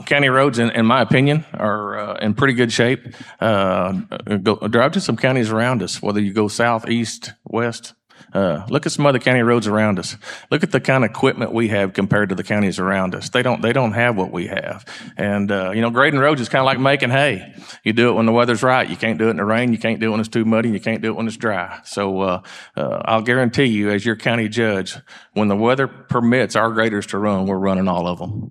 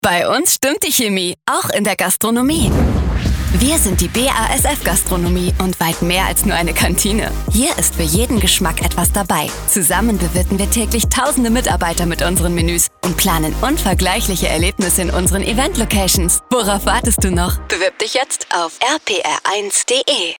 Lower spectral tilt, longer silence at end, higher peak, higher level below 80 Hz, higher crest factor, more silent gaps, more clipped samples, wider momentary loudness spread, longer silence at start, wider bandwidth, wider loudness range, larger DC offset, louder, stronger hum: first, -5.5 dB/octave vs -3.5 dB/octave; about the same, 0 s vs 0.05 s; about the same, 0 dBFS vs -2 dBFS; second, -58 dBFS vs -24 dBFS; about the same, 18 dB vs 14 dB; neither; neither; first, 9 LU vs 4 LU; about the same, 0 s vs 0.05 s; second, 12 kHz vs over 20 kHz; about the same, 3 LU vs 1 LU; neither; second, -18 LUFS vs -15 LUFS; neither